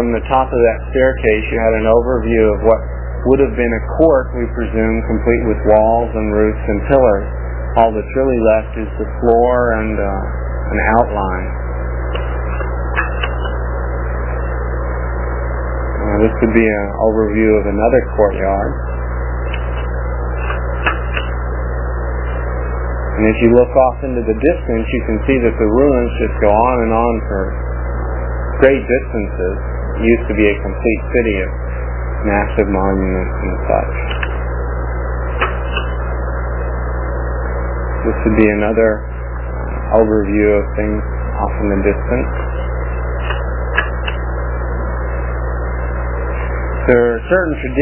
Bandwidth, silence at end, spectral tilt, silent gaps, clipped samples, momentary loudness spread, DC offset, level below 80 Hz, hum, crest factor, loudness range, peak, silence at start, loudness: 3.2 kHz; 0 s; -11.5 dB/octave; none; under 0.1%; 9 LU; under 0.1%; -20 dBFS; 60 Hz at -20 dBFS; 14 dB; 6 LU; 0 dBFS; 0 s; -16 LUFS